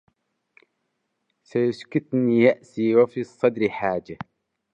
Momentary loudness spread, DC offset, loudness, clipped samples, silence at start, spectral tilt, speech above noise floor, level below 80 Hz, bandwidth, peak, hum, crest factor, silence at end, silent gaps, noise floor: 12 LU; under 0.1%; -22 LUFS; under 0.1%; 1.55 s; -8 dB/octave; 54 dB; -66 dBFS; 8.2 kHz; -4 dBFS; none; 20 dB; 0.6 s; none; -76 dBFS